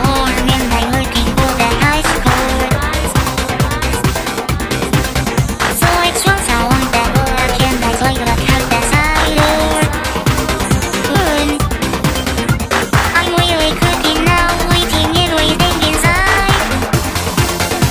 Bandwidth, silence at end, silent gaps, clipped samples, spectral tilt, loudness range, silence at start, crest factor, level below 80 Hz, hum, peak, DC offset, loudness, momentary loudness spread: 16 kHz; 0 s; none; under 0.1%; -4 dB/octave; 3 LU; 0 s; 14 dB; -22 dBFS; none; 0 dBFS; under 0.1%; -13 LUFS; 4 LU